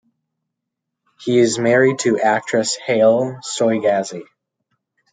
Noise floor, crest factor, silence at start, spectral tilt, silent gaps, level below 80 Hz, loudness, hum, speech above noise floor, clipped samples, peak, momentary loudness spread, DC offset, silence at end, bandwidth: -80 dBFS; 16 dB; 1.2 s; -4.5 dB/octave; none; -68 dBFS; -17 LUFS; none; 64 dB; under 0.1%; -2 dBFS; 9 LU; under 0.1%; 0.9 s; 9.6 kHz